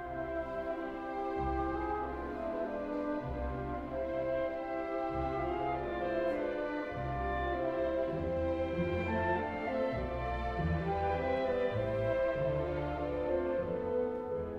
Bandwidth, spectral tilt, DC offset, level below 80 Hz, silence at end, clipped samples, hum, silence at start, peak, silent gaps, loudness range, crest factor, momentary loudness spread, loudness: 7.2 kHz; -8.5 dB/octave; under 0.1%; -48 dBFS; 0 s; under 0.1%; none; 0 s; -20 dBFS; none; 3 LU; 14 dB; 5 LU; -35 LUFS